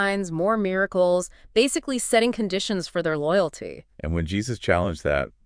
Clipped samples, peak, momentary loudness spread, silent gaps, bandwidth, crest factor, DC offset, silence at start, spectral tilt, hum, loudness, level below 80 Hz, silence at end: under 0.1%; -4 dBFS; 7 LU; none; 10.5 kHz; 20 dB; under 0.1%; 0 s; -4.5 dB/octave; none; -24 LUFS; -44 dBFS; 0.15 s